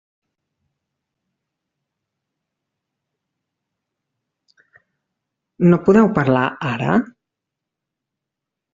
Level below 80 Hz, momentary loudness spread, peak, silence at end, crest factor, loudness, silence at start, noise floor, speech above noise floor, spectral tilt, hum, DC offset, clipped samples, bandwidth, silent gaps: -56 dBFS; 9 LU; -2 dBFS; 1.7 s; 20 dB; -16 LUFS; 5.6 s; -83 dBFS; 68 dB; -7 dB/octave; none; under 0.1%; under 0.1%; 7.6 kHz; none